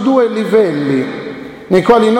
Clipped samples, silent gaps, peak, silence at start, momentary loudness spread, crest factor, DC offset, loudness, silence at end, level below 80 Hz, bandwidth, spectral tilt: under 0.1%; none; 0 dBFS; 0 s; 15 LU; 12 dB; under 0.1%; -13 LUFS; 0 s; -48 dBFS; 11.5 kHz; -7 dB/octave